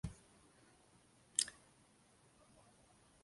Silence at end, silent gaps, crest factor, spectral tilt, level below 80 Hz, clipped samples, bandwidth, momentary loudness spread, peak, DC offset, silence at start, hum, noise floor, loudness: 1.7 s; none; 38 dB; -1 dB/octave; -66 dBFS; under 0.1%; 11.5 kHz; 28 LU; -12 dBFS; under 0.1%; 0.05 s; none; -70 dBFS; -41 LUFS